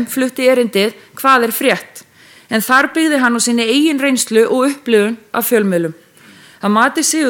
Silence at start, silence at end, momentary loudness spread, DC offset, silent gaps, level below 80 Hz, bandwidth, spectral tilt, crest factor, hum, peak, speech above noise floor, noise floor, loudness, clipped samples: 0 s; 0 s; 7 LU; under 0.1%; none; -68 dBFS; 18 kHz; -3 dB/octave; 14 dB; none; 0 dBFS; 29 dB; -43 dBFS; -14 LUFS; under 0.1%